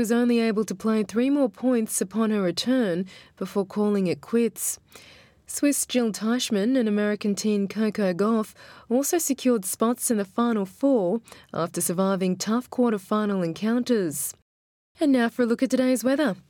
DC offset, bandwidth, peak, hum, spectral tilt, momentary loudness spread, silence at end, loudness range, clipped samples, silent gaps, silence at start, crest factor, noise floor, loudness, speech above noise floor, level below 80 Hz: under 0.1%; 18.5 kHz; -8 dBFS; none; -4.5 dB/octave; 6 LU; 0.1 s; 2 LU; under 0.1%; 14.42-14.95 s; 0 s; 16 dB; under -90 dBFS; -24 LUFS; over 66 dB; -68 dBFS